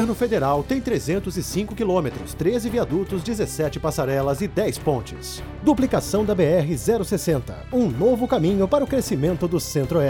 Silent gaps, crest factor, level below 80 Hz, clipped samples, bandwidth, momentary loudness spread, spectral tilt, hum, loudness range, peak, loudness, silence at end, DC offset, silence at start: none; 16 dB; -40 dBFS; under 0.1%; 20 kHz; 6 LU; -6 dB/octave; none; 3 LU; -6 dBFS; -22 LUFS; 0 s; under 0.1%; 0 s